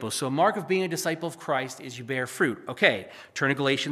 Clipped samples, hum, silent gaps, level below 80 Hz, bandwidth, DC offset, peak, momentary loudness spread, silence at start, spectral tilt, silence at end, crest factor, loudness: under 0.1%; none; none; -78 dBFS; 15 kHz; under 0.1%; -6 dBFS; 10 LU; 0 s; -4 dB/octave; 0 s; 20 dB; -26 LUFS